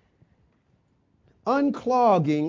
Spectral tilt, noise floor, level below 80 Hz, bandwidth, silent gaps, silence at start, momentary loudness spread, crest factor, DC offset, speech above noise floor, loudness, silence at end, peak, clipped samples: -8 dB/octave; -66 dBFS; -66 dBFS; 7.6 kHz; none; 1.45 s; 7 LU; 16 dB; under 0.1%; 45 dB; -23 LUFS; 0 s; -8 dBFS; under 0.1%